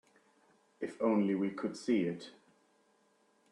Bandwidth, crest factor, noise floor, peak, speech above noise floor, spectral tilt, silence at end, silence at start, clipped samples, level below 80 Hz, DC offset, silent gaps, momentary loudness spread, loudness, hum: 10.5 kHz; 20 dB; -72 dBFS; -18 dBFS; 38 dB; -7 dB/octave; 1.2 s; 0.8 s; under 0.1%; -82 dBFS; under 0.1%; none; 14 LU; -34 LUFS; none